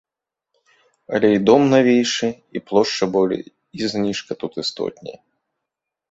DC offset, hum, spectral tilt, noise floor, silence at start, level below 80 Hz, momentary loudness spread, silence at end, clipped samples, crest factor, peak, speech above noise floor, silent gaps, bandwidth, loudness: under 0.1%; none; -5 dB/octave; -83 dBFS; 1.1 s; -60 dBFS; 14 LU; 1 s; under 0.1%; 20 dB; 0 dBFS; 64 dB; none; 8 kHz; -19 LUFS